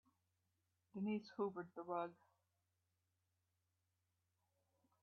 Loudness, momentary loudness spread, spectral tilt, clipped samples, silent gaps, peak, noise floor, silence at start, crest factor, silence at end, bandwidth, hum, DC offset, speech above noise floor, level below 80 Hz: -47 LUFS; 7 LU; -6.5 dB/octave; under 0.1%; none; -30 dBFS; -88 dBFS; 0.95 s; 22 dB; 2.9 s; 5.6 kHz; none; under 0.1%; 42 dB; under -90 dBFS